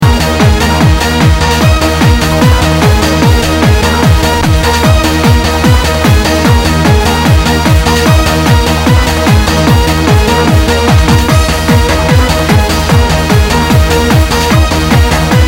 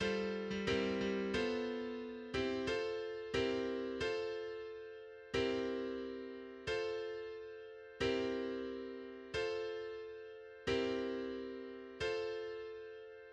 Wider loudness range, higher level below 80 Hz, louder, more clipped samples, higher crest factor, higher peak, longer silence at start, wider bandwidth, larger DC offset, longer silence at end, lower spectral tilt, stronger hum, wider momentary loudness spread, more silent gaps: second, 0 LU vs 3 LU; first, -14 dBFS vs -64 dBFS; first, -8 LUFS vs -40 LUFS; first, 0.8% vs under 0.1%; second, 6 dB vs 18 dB; first, 0 dBFS vs -24 dBFS; about the same, 0 s vs 0 s; first, 17 kHz vs 9.8 kHz; first, 0.6% vs under 0.1%; about the same, 0 s vs 0 s; about the same, -5 dB/octave vs -5 dB/octave; neither; second, 1 LU vs 13 LU; neither